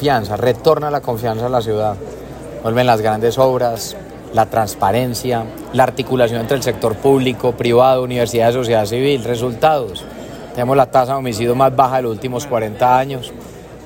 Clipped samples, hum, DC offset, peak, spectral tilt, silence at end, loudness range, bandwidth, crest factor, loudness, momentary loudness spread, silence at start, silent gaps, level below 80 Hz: under 0.1%; none; under 0.1%; 0 dBFS; -5.5 dB/octave; 0 s; 2 LU; 16.5 kHz; 16 dB; -16 LUFS; 13 LU; 0 s; none; -44 dBFS